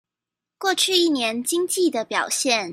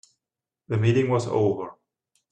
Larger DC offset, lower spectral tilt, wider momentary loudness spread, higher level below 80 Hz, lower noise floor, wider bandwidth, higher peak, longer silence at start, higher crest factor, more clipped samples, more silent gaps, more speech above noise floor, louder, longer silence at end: neither; second, -1 dB/octave vs -7.5 dB/octave; second, 6 LU vs 11 LU; second, -74 dBFS vs -60 dBFS; about the same, -87 dBFS vs -89 dBFS; first, 16 kHz vs 9.4 kHz; first, -4 dBFS vs -10 dBFS; about the same, 0.6 s vs 0.7 s; about the same, 18 dB vs 16 dB; neither; neither; about the same, 66 dB vs 67 dB; first, -21 LUFS vs -24 LUFS; second, 0 s vs 0.6 s